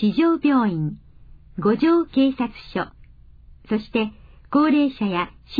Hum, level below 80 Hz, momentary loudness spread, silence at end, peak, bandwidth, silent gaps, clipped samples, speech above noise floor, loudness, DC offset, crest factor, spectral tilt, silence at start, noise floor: none; -48 dBFS; 11 LU; 0 s; -6 dBFS; 5 kHz; none; under 0.1%; 27 dB; -21 LUFS; under 0.1%; 14 dB; -9 dB/octave; 0 s; -46 dBFS